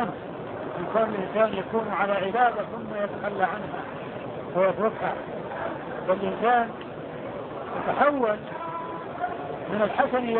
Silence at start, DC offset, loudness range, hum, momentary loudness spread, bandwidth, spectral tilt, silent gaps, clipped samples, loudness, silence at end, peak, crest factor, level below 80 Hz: 0 s; under 0.1%; 3 LU; none; 12 LU; 4.4 kHz; -10 dB/octave; none; under 0.1%; -27 LUFS; 0 s; -6 dBFS; 20 dB; -60 dBFS